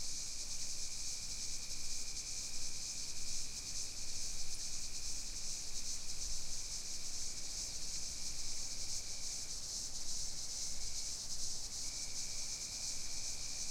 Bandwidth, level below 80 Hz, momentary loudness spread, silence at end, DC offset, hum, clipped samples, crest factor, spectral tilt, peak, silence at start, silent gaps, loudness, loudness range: 16 kHz; -50 dBFS; 1 LU; 0 s; under 0.1%; none; under 0.1%; 14 dB; 0 dB/octave; -26 dBFS; 0 s; none; -41 LUFS; 1 LU